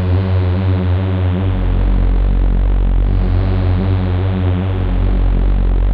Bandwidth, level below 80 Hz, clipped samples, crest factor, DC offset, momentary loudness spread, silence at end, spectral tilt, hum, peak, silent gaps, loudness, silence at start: 4.5 kHz; -16 dBFS; under 0.1%; 10 dB; under 0.1%; 2 LU; 0 s; -10.5 dB/octave; none; -4 dBFS; none; -16 LUFS; 0 s